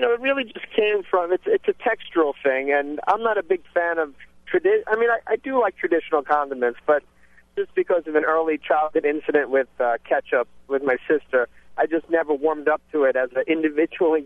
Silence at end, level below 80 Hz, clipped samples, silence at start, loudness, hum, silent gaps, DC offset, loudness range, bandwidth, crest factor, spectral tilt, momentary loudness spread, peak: 0 s; -62 dBFS; under 0.1%; 0 s; -22 LUFS; none; none; under 0.1%; 1 LU; 3.9 kHz; 16 dB; -6 dB/octave; 4 LU; -6 dBFS